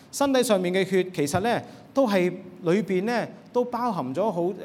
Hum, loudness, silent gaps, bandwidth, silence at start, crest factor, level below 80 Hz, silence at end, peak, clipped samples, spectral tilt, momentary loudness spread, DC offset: none; -25 LUFS; none; 16.5 kHz; 0.15 s; 16 dB; -64 dBFS; 0 s; -8 dBFS; under 0.1%; -5.5 dB/octave; 7 LU; under 0.1%